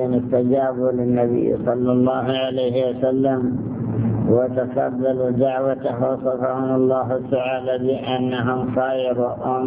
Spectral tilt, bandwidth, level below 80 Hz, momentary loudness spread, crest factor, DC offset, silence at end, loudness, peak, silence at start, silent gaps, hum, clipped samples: -11.5 dB/octave; 3.9 kHz; -50 dBFS; 4 LU; 16 dB; under 0.1%; 0 s; -20 LUFS; -4 dBFS; 0 s; none; none; under 0.1%